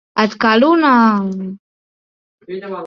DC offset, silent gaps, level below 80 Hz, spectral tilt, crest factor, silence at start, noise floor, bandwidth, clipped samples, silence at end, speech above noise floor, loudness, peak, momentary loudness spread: under 0.1%; 1.59-2.38 s; -60 dBFS; -6.5 dB/octave; 14 dB; 0.15 s; under -90 dBFS; 6.6 kHz; under 0.1%; 0 s; over 76 dB; -13 LUFS; -2 dBFS; 18 LU